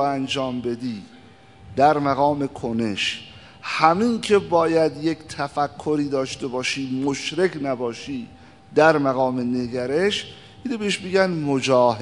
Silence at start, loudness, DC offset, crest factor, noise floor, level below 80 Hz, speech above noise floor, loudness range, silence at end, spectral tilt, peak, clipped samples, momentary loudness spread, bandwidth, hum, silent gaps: 0 s; -22 LUFS; 0.1%; 22 dB; -48 dBFS; -58 dBFS; 26 dB; 4 LU; 0 s; -5 dB/octave; 0 dBFS; under 0.1%; 14 LU; 11 kHz; none; none